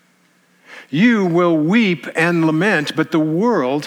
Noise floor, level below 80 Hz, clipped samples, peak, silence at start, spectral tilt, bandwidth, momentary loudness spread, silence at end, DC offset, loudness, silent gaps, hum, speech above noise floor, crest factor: -57 dBFS; -76 dBFS; under 0.1%; -2 dBFS; 0.7 s; -6.5 dB/octave; 13.5 kHz; 4 LU; 0 s; under 0.1%; -16 LUFS; none; none; 41 dB; 14 dB